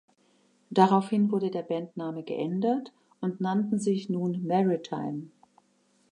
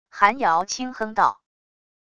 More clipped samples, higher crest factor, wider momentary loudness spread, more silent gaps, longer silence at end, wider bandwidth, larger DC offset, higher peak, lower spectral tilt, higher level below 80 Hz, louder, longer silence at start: neither; about the same, 22 dB vs 22 dB; first, 12 LU vs 9 LU; neither; about the same, 0.85 s vs 0.8 s; about the same, 10.5 kHz vs 10.5 kHz; neither; second, -6 dBFS vs -2 dBFS; first, -7.5 dB/octave vs -2.5 dB/octave; second, -80 dBFS vs -62 dBFS; second, -28 LUFS vs -22 LUFS; first, 0.7 s vs 0.15 s